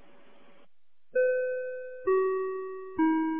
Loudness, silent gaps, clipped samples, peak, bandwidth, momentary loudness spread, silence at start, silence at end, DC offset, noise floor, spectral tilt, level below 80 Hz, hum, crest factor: -30 LUFS; none; under 0.1%; -16 dBFS; 3.6 kHz; 10 LU; 1.15 s; 0 s; 0.4%; -73 dBFS; -4 dB/octave; -68 dBFS; none; 14 dB